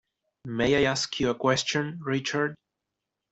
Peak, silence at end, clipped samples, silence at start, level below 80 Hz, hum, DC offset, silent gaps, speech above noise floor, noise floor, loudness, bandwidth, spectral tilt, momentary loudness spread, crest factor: -8 dBFS; 0.75 s; under 0.1%; 0.45 s; -56 dBFS; none; under 0.1%; none; 59 dB; -85 dBFS; -26 LUFS; 8.2 kHz; -4 dB/octave; 8 LU; 20 dB